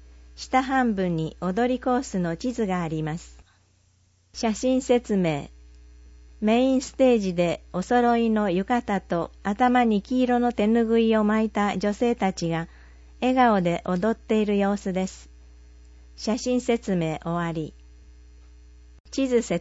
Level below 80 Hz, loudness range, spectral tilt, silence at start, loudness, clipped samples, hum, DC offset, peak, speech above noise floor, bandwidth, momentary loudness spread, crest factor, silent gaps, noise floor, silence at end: -48 dBFS; 6 LU; -6 dB/octave; 0.35 s; -24 LUFS; under 0.1%; 60 Hz at -45 dBFS; under 0.1%; -8 dBFS; 39 dB; 8 kHz; 9 LU; 16 dB; 19.00-19.04 s; -62 dBFS; 0 s